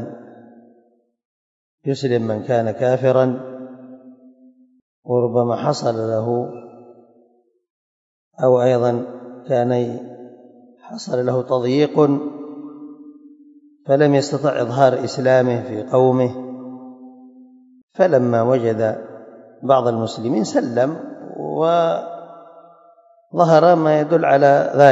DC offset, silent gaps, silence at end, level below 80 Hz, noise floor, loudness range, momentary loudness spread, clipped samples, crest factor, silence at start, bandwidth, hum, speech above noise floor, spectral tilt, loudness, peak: under 0.1%; 1.25-1.78 s, 4.82-5.03 s, 7.70-8.31 s, 17.83-17.88 s; 0 s; -70 dBFS; -59 dBFS; 5 LU; 20 LU; under 0.1%; 20 dB; 0 s; 8 kHz; none; 42 dB; -7 dB/octave; -18 LUFS; 0 dBFS